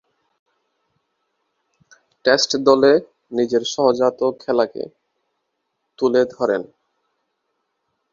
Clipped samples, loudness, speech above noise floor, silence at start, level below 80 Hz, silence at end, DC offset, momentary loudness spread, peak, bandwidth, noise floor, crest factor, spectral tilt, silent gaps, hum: under 0.1%; -18 LUFS; 57 dB; 2.25 s; -64 dBFS; 1.5 s; under 0.1%; 11 LU; 0 dBFS; 7.6 kHz; -74 dBFS; 20 dB; -3.5 dB/octave; none; none